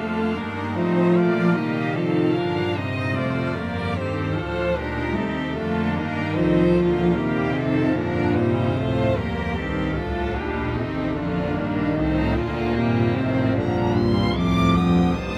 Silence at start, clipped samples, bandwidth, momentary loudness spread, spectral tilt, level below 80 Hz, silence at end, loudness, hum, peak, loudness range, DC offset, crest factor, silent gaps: 0 s; under 0.1%; 9.2 kHz; 7 LU; -8 dB/octave; -38 dBFS; 0 s; -22 LUFS; none; -8 dBFS; 4 LU; under 0.1%; 14 dB; none